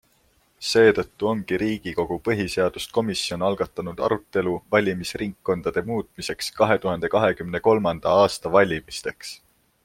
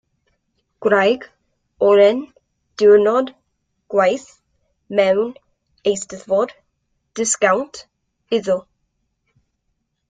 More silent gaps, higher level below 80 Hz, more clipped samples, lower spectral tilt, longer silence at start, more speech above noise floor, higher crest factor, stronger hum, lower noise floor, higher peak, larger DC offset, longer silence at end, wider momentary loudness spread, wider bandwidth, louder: neither; first, -52 dBFS vs -62 dBFS; neither; first, -5 dB/octave vs -3.5 dB/octave; second, 0.6 s vs 0.8 s; second, 40 dB vs 56 dB; about the same, 20 dB vs 18 dB; neither; second, -63 dBFS vs -72 dBFS; about the same, -2 dBFS vs -2 dBFS; neither; second, 0.5 s vs 1.5 s; second, 10 LU vs 15 LU; first, 16 kHz vs 9.6 kHz; second, -23 LUFS vs -18 LUFS